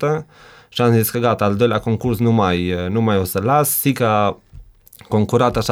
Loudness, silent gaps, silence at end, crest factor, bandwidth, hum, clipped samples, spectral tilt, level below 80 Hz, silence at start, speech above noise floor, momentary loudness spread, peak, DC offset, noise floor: -17 LUFS; none; 0 s; 16 dB; 19 kHz; none; under 0.1%; -5.5 dB/octave; -44 dBFS; 0 s; 25 dB; 6 LU; -2 dBFS; under 0.1%; -42 dBFS